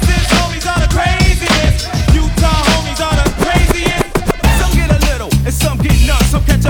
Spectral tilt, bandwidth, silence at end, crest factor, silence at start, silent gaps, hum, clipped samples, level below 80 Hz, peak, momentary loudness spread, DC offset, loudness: -4.5 dB/octave; 19 kHz; 0 s; 12 dB; 0 s; none; none; under 0.1%; -14 dBFS; 0 dBFS; 4 LU; under 0.1%; -13 LUFS